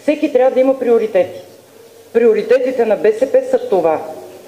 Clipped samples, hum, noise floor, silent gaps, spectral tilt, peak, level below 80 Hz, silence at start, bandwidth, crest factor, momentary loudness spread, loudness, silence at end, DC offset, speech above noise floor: under 0.1%; none; -42 dBFS; none; -6 dB/octave; 0 dBFS; -62 dBFS; 0.05 s; 15 kHz; 14 dB; 8 LU; -14 LUFS; 0.1 s; under 0.1%; 28 dB